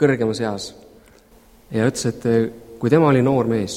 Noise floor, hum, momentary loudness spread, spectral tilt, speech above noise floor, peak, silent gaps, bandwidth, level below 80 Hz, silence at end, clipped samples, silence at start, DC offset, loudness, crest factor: -50 dBFS; none; 12 LU; -6.5 dB/octave; 32 dB; -2 dBFS; none; 16 kHz; -52 dBFS; 0 s; under 0.1%; 0 s; under 0.1%; -19 LUFS; 18 dB